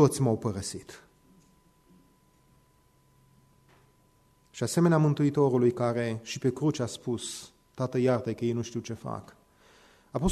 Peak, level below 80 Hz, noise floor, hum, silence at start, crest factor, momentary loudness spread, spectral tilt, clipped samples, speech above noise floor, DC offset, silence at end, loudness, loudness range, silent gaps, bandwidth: -10 dBFS; -54 dBFS; -64 dBFS; none; 0 s; 20 dB; 15 LU; -6.5 dB/octave; under 0.1%; 37 dB; under 0.1%; 0 s; -29 LUFS; 9 LU; none; 13.5 kHz